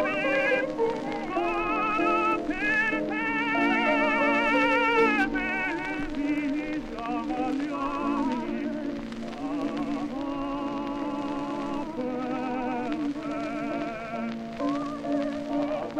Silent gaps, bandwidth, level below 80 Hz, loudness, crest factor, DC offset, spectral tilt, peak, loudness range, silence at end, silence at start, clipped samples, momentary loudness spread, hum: none; 9.8 kHz; -50 dBFS; -27 LUFS; 16 dB; under 0.1%; -5.5 dB/octave; -12 dBFS; 8 LU; 0 s; 0 s; under 0.1%; 10 LU; none